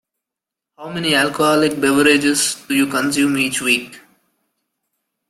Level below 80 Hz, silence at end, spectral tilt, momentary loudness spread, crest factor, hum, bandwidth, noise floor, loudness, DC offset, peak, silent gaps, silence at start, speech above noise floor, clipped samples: -58 dBFS; 1.3 s; -3 dB/octave; 9 LU; 18 dB; none; 15.5 kHz; -85 dBFS; -16 LUFS; under 0.1%; 0 dBFS; none; 0.8 s; 69 dB; under 0.1%